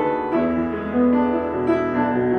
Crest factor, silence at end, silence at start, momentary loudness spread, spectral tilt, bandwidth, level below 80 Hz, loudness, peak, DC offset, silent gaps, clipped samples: 12 dB; 0 s; 0 s; 4 LU; -9 dB/octave; 4.3 kHz; -44 dBFS; -21 LUFS; -8 dBFS; under 0.1%; none; under 0.1%